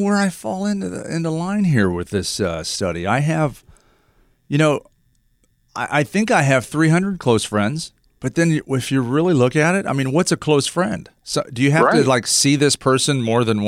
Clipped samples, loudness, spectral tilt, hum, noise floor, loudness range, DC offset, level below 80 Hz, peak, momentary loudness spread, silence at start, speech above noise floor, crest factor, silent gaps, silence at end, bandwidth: under 0.1%; -18 LUFS; -5 dB/octave; none; -61 dBFS; 5 LU; under 0.1%; -50 dBFS; -4 dBFS; 9 LU; 0 s; 43 dB; 16 dB; none; 0 s; 16 kHz